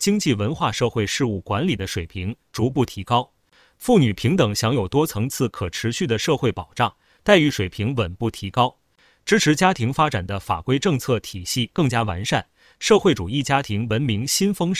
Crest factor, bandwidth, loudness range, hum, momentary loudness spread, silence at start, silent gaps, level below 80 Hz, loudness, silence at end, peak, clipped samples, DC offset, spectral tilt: 20 dB; 16 kHz; 2 LU; none; 8 LU; 0 s; none; -44 dBFS; -21 LUFS; 0 s; -2 dBFS; under 0.1%; under 0.1%; -5 dB/octave